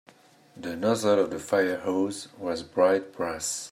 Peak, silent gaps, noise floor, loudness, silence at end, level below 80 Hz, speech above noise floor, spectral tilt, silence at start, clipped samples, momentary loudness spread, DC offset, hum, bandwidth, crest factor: -8 dBFS; none; -56 dBFS; -27 LUFS; 0 s; -66 dBFS; 30 dB; -4 dB/octave; 0.55 s; under 0.1%; 10 LU; under 0.1%; none; 16 kHz; 18 dB